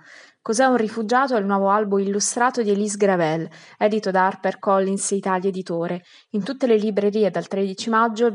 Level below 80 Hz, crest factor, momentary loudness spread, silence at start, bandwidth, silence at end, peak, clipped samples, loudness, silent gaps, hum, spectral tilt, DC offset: -88 dBFS; 16 dB; 8 LU; 0.1 s; 11.5 kHz; 0 s; -4 dBFS; under 0.1%; -21 LUFS; none; none; -4.5 dB/octave; under 0.1%